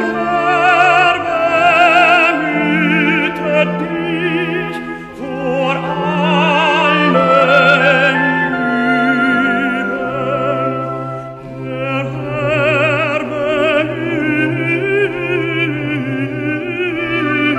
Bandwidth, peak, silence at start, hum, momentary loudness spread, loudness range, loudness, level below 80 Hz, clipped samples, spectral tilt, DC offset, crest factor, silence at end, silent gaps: 13 kHz; 0 dBFS; 0 s; none; 10 LU; 6 LU; -14 LUFS; -48 dBFS; under 0.1%; -6 dB/octave; under 0.1%; 14 dB; 0 s; none